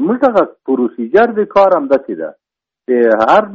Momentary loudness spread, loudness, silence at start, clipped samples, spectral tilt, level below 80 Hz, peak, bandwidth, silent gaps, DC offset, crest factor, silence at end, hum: 14 LU; -12 LUFS; 0 s; under 0.1%; -4.5 dB/octave; -54 dBFS; 0 dBFS; 7.4 kHz; none; under 0.1%; 12 dB; 0 s; none